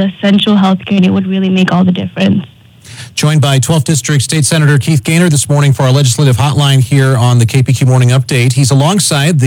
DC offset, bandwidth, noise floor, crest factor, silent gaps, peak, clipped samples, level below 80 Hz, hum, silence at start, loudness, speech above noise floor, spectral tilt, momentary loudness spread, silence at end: under 0.1%; 17 kHz; -32 dBFS; 8 dB; none; 0 dBFS; under 0.1%; -48 dBFS; none; 0 s; -9 LUFS; 23 dB; -5.5 dB/octave; 3 LU; 0 s